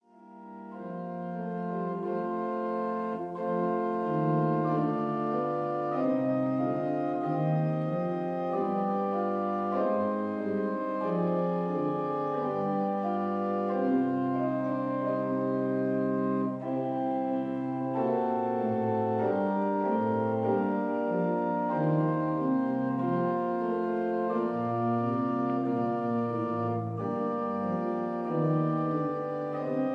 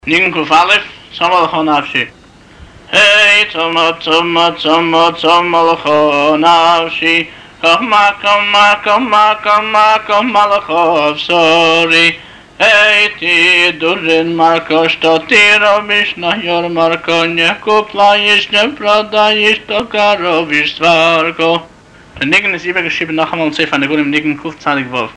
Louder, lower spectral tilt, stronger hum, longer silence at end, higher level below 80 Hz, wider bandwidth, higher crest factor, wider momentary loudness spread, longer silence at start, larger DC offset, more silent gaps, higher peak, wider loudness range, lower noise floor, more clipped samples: second, -30 LUFS vs -10 LUFS; first, -10.5 dB/octave vs -3.5 dB/octave; neither; about the same, 0 s vs 0.05 s; second, -76 dBFS vs -48 dBFS; second, 5.6 kHz vs 10.5 kHz; about the same, 14 dB vs 10 dB; second, 4 LU vs 7 LU; first, 0.2 s vs 0.05 s; neither; neither; second, -16 dBFS vs -2 dBFS; about the same, 2 LU vs 3 LU; first, -50 dBFS vs -38 dBFS; neither